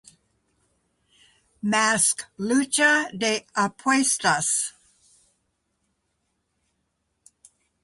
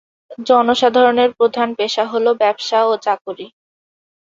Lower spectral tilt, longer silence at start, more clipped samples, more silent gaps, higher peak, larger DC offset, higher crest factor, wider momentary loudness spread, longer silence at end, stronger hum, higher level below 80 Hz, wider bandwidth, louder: second, -2 dB/octave vs -3.5 dB/octave; first, 1.65 s vs 0.3 s; neither; second, none vs 3.21-3.25 s; second, -6 dBFS vs 0 dBFS; neither; about the same, 20 dB vs 16 dB; second, 7 LU vs 10 LU; first, 3.15 s vs 0.85 s; neither; second, -68 dBFS vs -62 dBFS; first, 12 kHz vs 7.6 kHz; second, -22 LUFS vs -15 LUFS